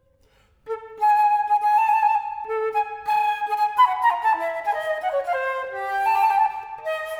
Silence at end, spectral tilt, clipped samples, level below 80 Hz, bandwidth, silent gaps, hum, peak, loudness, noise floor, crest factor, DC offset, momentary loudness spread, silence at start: 0 s; -1.5 dB/octave; under 0.1%; -64 dBFS; 20 kHz; none; none; -8 dBFS; -22 LUFS; -59 dBFS; 14 dB; under 0.1%; 10 LU; 0.65 s